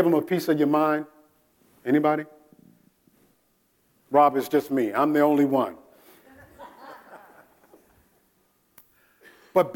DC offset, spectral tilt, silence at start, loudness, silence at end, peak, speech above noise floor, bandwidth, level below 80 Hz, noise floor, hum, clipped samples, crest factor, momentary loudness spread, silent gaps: under 0.1%; -7 dB/octave; 0 s; -23 LUFS; 0 s; -6 dBFS; 46 dB; 17.5 kHz; -74 dBFS; -67 dBFS; none; under 0.1%; 20 dB; 24 LU; none